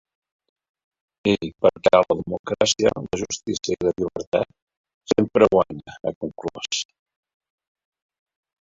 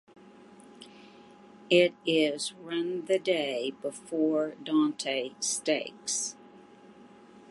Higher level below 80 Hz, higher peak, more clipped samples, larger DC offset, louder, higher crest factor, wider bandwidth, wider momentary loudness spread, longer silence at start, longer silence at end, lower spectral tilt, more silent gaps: first, -54 dBFS vs -80 dBFS; first, -2 dBFS vs -8 dBFS; neither; neither; first, -22 LUFS vs -29 LUFS; about the same, 22 dB vs 22 dB; second, 7.8 kHz vs 11.5 kHz; about the same, 13 LU vs 13 LU; first, 1.25 s vs 0.5 s; first, 1.9 s vs 0.1 s; about the same, -4 dB/octave vs -3 dB/octave; first, 2.39-2.44 s, 4.27-4.32 s, 4.62-4.67 s, 4.77-4.84 s, 4.94-5.01 s, 6.15-6.21 s vs none